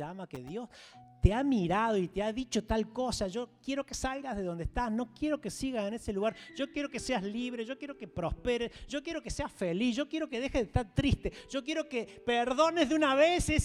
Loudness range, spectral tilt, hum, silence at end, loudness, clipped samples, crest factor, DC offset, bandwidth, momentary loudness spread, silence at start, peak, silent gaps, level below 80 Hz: 4 LU; -5 dB/octave; none; 0 s; -33 LUFS; under 0.1%; 22 dB; under 0.1%; 15 kHz; 12 LU; 0 s; -10 dBFS; none; -44 dBFS